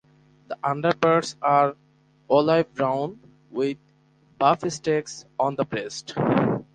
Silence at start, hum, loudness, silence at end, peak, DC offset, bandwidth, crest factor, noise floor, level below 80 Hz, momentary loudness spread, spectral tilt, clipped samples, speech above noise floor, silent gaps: 0.5 s; none; -24 LUFS; 0.1 s; -4 dBFS; under 0.1%; 9.8 kHz; 20 dB; -59 dBFS; -62 dBFS; 11 LU; -5.5 dB/octave; under 0.1%; 36 dB; none